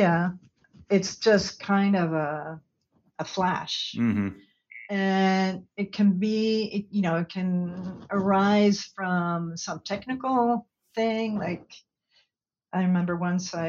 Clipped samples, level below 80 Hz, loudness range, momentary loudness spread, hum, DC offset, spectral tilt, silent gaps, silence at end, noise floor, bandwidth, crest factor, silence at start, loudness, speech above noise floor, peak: under 0.1%; -64 dBFS; 4 LU; 11 LU; none; under 0.1%; -6 dB/octave; none; 0 s; -79 dBFS; 7.6 kHz; 18 dB; 0 s; -26 LUFS; 54 dB; -8 dBFS